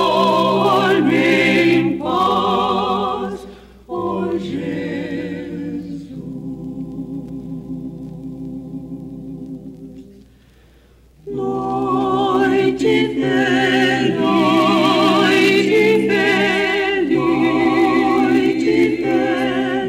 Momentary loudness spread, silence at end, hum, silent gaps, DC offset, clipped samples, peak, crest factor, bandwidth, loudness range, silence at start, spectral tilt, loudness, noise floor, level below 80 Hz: 17 LU; 0 s; none; none; under 0.1%; under 0.1%; -4 dBFS; 14 dB; 15.5 kHz; 16 LU; 0 s; -5.5 dB/octave; -16 LUFS; -49 dBFS; -48 dBFS